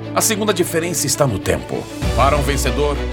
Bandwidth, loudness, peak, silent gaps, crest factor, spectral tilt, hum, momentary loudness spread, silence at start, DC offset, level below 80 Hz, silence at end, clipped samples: 18.5 kHz; -18 LUFS; 0 dBFS; none; 18 dB; -4 dB/octave; none; 6 LU; 0 s; under 0.1%; -26 dBFS; 0 s; under 0.1%